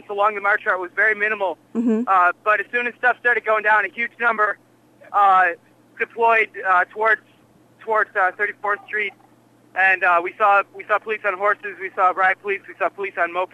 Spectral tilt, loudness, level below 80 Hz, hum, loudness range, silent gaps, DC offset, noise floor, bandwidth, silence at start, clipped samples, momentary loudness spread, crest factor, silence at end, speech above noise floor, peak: -5 dB/octave; -19 LUFS; -78 dBFS; none; 2 LU; none; under 0.1%; -54 dBFS; 11 kHz; 0.1 s; under 0.1%; 8 LU; 14 dB; 0.1 s; 34 dB; -6 dBFS